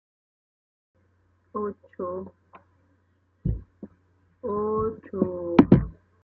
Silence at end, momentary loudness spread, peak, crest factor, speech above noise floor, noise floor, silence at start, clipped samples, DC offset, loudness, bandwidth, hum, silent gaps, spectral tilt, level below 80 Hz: 0.3 s; 21 LU; 0 dBFS; 28 dB; 38 dB; -67 dBFS; 1.55 s; under 0.1%; under 0.1%; -26 LUFS; 6.2 kHz; none; none; -10.5 dB/octave; -44 dBFS